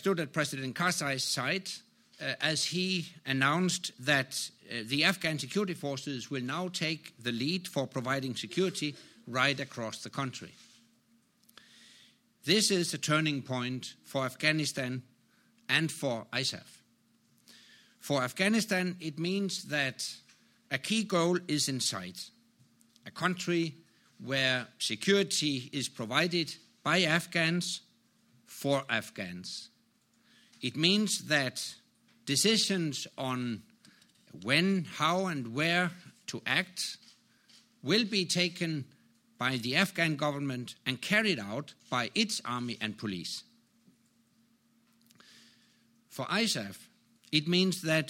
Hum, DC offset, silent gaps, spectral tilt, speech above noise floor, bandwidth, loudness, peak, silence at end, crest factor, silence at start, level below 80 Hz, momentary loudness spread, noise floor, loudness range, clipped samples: none; under 0.1%; none; -3.5 dB/octave; 38 dB; 16.5 kHz; -31 LUFS; -8 dBFS; 0 s; 24 dB; 0 s; -76 dBFS; 13 LU; -70 dBFS; 6 LU; under 0.1%